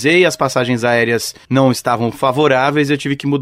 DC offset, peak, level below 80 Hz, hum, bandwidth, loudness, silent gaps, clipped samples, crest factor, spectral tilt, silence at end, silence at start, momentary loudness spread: under 0.1%; -2 dBFS; -52 dBFS; none; 16 kHz; -15 LUFS; none; under 0.1%; 14 dB; -5 dB/octave; 0 s; 0 s; 5 LU